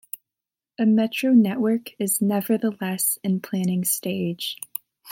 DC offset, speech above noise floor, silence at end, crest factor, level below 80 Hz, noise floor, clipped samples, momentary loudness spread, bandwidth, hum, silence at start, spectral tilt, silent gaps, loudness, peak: under 0.1%; 66 dB; 0 s; 16 dB; -74 dBFS; -88 dBFS; under 0.1%; 13 LU; 17 kHz; none; 0.8 s; -4.5 dB/octave; none; -23 LUFS; -6 dBFS